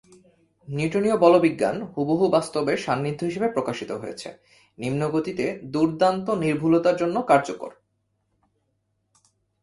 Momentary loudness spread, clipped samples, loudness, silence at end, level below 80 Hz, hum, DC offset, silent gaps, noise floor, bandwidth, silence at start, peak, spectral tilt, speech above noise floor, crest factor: 14 LU; under 0.1%; -23 LUFS; 1.9 s; -62 dBFS; none; under 0.1%; none; -73 dBFS; 11.5 kHz; 0.65 s; -2 dBFS; -6.5 dB/octave; 50 dB; 22 dB